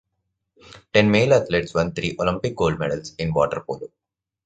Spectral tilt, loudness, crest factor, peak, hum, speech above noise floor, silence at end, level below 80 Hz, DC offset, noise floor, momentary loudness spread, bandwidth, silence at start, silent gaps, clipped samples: -6 dB/octave; -21 LUFS; 20 dB; -2 dBFS; none; 56 dB; 0.6 s; -46 dBFS; under 0.1%; -77 dBFS; 12 LU; 9 kHz; 0.7 s; none; under 0.1%